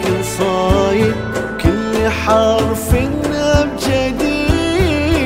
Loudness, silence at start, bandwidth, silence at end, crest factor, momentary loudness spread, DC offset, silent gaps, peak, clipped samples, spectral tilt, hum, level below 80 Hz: -15 LUFS; 0 s; 16.5 kHz; 0 s; 14 dB; 4 LU; under 0.1%; none; 0 dBFS; under 0.1%; -5.5 dB/octave; none; -26 dBFS